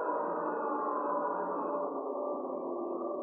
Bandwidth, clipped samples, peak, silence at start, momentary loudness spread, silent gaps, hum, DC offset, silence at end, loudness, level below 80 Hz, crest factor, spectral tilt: 2.8 kHz; under 0.1%; -22 dBFS; 0 s; 4 LU; none; none; under 0.1%; 0 s; -35 LUFS; under -90 dBFS; 12 dB; -0.5 dB/octave